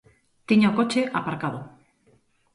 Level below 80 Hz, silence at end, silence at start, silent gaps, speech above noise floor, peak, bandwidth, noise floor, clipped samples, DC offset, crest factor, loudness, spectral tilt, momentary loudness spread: -64 dBFS; 0.85 s; 0.5 s; none; 40 dB; -6 dBFS; 11 kHz; -63 dBFS; under 0.1%; under 0.1%; 18 dB; -23 LUFS; -6 dB/octave; 12 LU